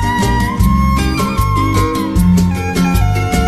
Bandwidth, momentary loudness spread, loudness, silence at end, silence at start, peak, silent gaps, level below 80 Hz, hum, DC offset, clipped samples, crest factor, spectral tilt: 14.5 kHz; 3 LU; -14 LUFS; 0 s; 0 s; 0 dBFS; none; -18 dBFS; none; under 0.1%; under 0.1%; 12 dB; -6 dB/octave